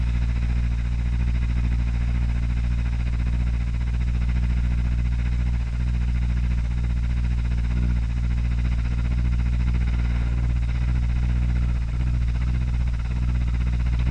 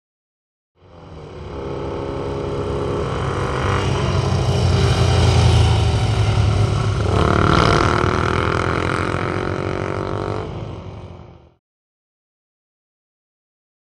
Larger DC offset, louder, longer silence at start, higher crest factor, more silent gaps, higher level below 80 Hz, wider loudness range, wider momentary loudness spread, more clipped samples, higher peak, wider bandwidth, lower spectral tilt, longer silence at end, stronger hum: neither; second, -25 LUFS vs -19 LUFS; second, 0 s vs 0.95 s; second, 10 dB vs 18 dB; neither; first, -22 dBFS vs -30 dBFS; second, 1 LU vs 12 LU; second, 2 LU vs 16 LU; neither; second, -10 dBFS vs 0 dBFS; second, 6.2 kHz vs 11.5 kHz; first, -7.5 dB/octave vs -6 dB/octave; second, 0 s vs 2.5 s; first, 60 Hz at -30 dBFS vs none